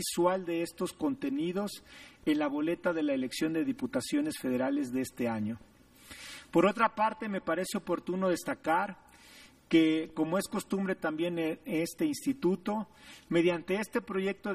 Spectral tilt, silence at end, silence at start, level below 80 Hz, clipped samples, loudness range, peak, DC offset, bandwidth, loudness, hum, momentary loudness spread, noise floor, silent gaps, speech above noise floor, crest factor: -5 dB/octave; 0 s; 0 s; -66 dBFS; under 0.1%; 2 LU; -14 dBFS; under 0.1%; 15.5 kHz; -32 LUFS; none; 9 LU; -56 dBFS; none; 25 dB; 18 dB